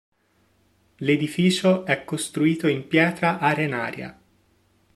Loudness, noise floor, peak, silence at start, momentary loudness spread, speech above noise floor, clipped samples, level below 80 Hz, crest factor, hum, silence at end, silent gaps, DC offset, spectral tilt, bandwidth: -22 LUFS; -64 dBFS; -4 dBFS; 1 s; 9 LU; 42 dB; under 0.1%; -64 dBFS; 20 dB; none; 0.85 s; none; under 0.1%; -5.5 dB/octave; 13.5 kHz